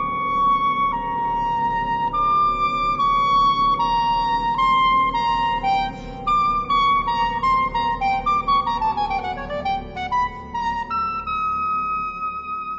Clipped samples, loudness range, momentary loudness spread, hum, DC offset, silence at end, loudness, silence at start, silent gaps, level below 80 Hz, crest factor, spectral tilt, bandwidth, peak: under 0.1%; 5 LU; 8 LU; none; under 0.1%; 0 s; -20 LUFS; 0 s; none; -40 dBFS; 12 dB; -5 dB/octave; 7.8 kHz; -10 dBFS